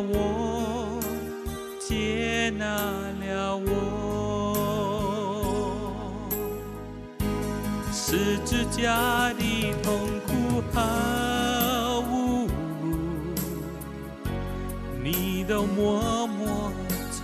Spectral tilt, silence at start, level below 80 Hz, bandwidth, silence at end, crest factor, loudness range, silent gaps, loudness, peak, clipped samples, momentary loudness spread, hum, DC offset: -5 dB/octave; 0 s; -40 dBFS; 14 kHz; 0 s; 16 dB; 4 LU; none; -28 LUFS; -10 dBFS; under 0.1%; 9 LU; none; under 0.1%